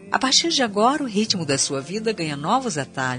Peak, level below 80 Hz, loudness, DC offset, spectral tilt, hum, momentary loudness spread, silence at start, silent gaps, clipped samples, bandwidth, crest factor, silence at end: -2 dBFS; -62 dBFS; -21 LUFS; under 0.1%; -3 dB/octave; none; 9 LU; 0 s; none; under 0.1%; 10 kHz; 18 dB; 0 s